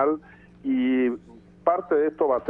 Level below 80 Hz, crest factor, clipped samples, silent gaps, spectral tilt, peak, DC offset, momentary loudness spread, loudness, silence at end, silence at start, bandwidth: -60 dBFS; 16 dB; under 0.1%; none; -8.5 dB/octave; -8 dBFS; under 0.1%; 11 LU; -25 LUFS; 0 s; 0 s; 3.6 kHz